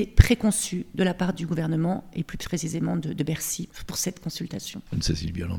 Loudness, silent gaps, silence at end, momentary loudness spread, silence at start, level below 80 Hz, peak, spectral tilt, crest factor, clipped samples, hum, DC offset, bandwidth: -27 LUFS; none; 0 s; 11 LU; 0 s; -32 dBFS; 0 dBFS; -5 dB/octave; 26 dB; under 0.1%; none; under 0.1%; 18 kHz